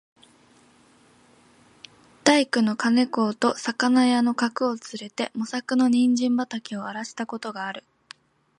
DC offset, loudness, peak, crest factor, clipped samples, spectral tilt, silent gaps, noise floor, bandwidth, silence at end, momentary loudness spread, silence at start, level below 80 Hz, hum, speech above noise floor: under 0.1%; -23 LUFS; -2 dBFS; 22 dB; under 0.1%; -4 dB/octave; none; -57 dBFS; 11 kHz; 0.8 s; 13 LU; 2.25 s; -74 dBFS; none; 34 dB